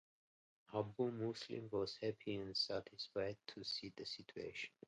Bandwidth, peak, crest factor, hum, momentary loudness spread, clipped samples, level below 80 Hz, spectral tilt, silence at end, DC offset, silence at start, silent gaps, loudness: 11 kHz; -26 dBFS; 20 dB; none; 8 LU; under 0.1%; -76 dBFS; -5 dB/octave; 0.2 s; under 0.1%; 0.7 s; none; -45 LUFS